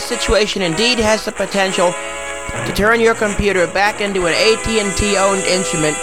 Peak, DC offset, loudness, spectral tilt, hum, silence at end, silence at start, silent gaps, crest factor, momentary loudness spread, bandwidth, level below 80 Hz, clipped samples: 0 dBFS; 1%; -15 LUFS; -3 dB/octave; none; 0 s; 0 s; none; 16 dB; 7 LU; 16.5 kHz; -32 dBFS; under 0.1%